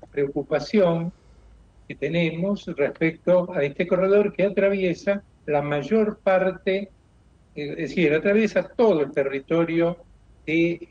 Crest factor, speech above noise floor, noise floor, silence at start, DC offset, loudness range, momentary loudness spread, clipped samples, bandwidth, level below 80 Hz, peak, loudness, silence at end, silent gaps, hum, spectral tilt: 14 dB; 34 dB; -56 dBFS; 0.15 s; under 0.1%; 3 LU; 10 LU; under 0.1%; 7.4 kHz; -54 dBFS; -8 dBFS; -23 LUFS; 0.05 s; none; none; -7.5 dB/octave